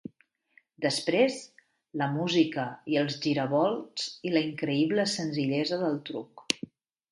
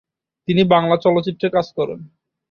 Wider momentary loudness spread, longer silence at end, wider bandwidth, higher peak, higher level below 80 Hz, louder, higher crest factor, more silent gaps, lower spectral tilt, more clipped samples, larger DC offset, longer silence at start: second, 9 LU vs 12 LU; about the same, 0.55 s vs 0.45 s; first, 11.5 kHz vs 6.8 kHz; about the same, -4 dBFS vs -2 dBFS; second, -74 dBFS vs -56 dBFS; second, -29 LUFS vs -18 LUFS; first, 24 dB vs 18 dB; neither; second, -5 dB/octave vs -8 dB/octave; neither; neither; first, 0.8 s vs 0.5 s